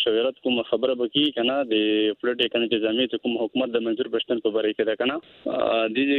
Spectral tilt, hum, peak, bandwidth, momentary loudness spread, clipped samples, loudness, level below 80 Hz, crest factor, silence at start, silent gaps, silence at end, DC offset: -6.5 dB/octave; none; -8 dBFS; 4.3 kHz; 4 LU; under 0.1%; -24 LUFS; -68 dBFS; 16 dB; 0 s; none; 0 s; under 0.1%